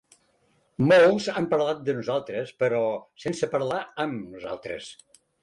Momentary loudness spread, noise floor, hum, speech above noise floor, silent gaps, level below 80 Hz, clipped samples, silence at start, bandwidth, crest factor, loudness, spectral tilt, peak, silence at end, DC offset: 18 LU; -67 dBFS; none; 42 dB; none; -64 dBFS; under 0.1%; 0.8 s; 11.5 kHz; 14 dB; -25 LUFS; -6 dB/octave; -10 dBFS; 0.5 s; under 0.1%